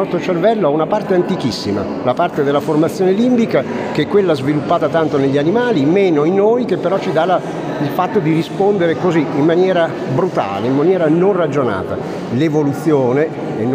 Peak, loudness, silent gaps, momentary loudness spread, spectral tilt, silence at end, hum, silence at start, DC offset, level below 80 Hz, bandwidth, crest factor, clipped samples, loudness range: -2 dBFS; -15 LUFS; none; 6 LU; -7 dB/octave; 0 s; none; 0 s; under 0.1%; -54 dBFS; 15.5 kHz; 12 dB; under 0.1%; 1 LU